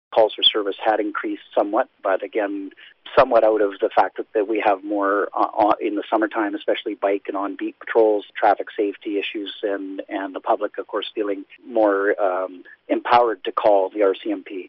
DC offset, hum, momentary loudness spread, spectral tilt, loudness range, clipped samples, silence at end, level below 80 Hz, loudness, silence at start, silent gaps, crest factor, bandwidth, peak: under 0.1%; none; 10 LU; -0.5 dB/octave; 4 LU; under 0.1%; 0 s; -60 dBFS; -21 LUFS; 0.1 s; none; 16 dB; 5.8 kHz; -6 dBFS